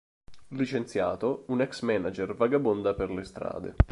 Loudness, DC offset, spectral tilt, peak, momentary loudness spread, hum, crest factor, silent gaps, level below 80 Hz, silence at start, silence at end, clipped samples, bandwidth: -29 LUFS; under 0.1%; -7.5 dB/octave; -6 dBFS; 10 LU; none; 22 dB; none; -36 dBFS; 0.3 s; 0 s; under 0.1%; 11.5 kHz